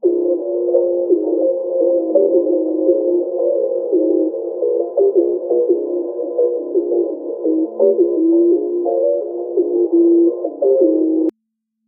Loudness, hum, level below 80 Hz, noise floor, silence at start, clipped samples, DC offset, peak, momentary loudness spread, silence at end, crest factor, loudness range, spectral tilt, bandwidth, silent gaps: -16 LUFS; none; -88 dBFS; -74 dBFS; 0.05 s; under 0.1%; under 0.1%; -2 dBFS; 6 LU; 0.55 s; 14 dB; 2 LU; -8 dB/octave; 1.1 kHz; none